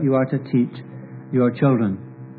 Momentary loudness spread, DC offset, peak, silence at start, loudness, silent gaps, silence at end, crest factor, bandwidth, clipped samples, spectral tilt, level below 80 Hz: 19 LU; under 0.1%; -4 dBFS; 0 s; -21 LUFS; none; 0 s; 16 dB; 4.7 kHz; under 0.1%; -12.5 dB/octave; -68 dBFS